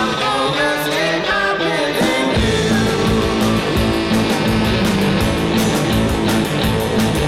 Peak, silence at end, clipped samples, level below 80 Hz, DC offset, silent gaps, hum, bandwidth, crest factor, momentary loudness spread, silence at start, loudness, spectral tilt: -8 dBFS; 0 s; under 0.1%; -30 dBFS; under 0.1%; none; none; 16.5 kHz; 8 dB; 1 LU; 0 s; -16 LUFS; -5 dB/octave